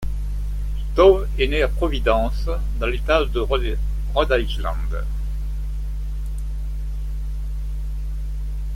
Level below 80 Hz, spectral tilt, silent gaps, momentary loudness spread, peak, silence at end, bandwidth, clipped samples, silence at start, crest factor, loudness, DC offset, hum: -24 dBFS; -6.5 dB/octave; none; 10 LU; -2 dBFS; 0 s; 11 kHz; under 0.1%; 0 s; 20 dB; -23 LUFS; under 0.1%; 50 Hz at -25 dBFS